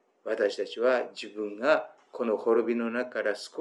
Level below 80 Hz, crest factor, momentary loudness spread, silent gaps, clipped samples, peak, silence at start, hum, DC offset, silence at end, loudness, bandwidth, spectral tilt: under -90 dBFS; 20 dB; 10 LU; none; under 0.1%; -10 dBFS; 0.25 s; none; under 0.1%; 0 s; -29 LUFS; 11.5 kHz; -4 dB/octave